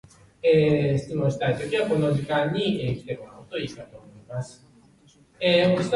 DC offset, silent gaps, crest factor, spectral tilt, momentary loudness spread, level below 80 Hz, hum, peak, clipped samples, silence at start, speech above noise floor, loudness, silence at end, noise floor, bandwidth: under 0.1%; none; 16 dB; -6.5 dB/octave; 16 LU; -54 dBFS; none; -8 dBFS; under 0.1%; 0.45 s; 33 dB; -24 LUFS; 0 s; -57 dBFS; 11.5 kHz